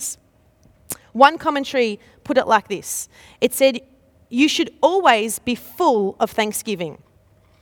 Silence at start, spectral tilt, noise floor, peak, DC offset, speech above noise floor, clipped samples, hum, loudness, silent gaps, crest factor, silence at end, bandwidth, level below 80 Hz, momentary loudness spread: 0 s; -3 dB/octave; -56 dBFS; 0 dBFS; under 0.1%; 37 dB; under 0.1%; none; -19 LUFS; none; 20 dB; 0.7 s; 19 kHz; -58 dBFS; 16 LU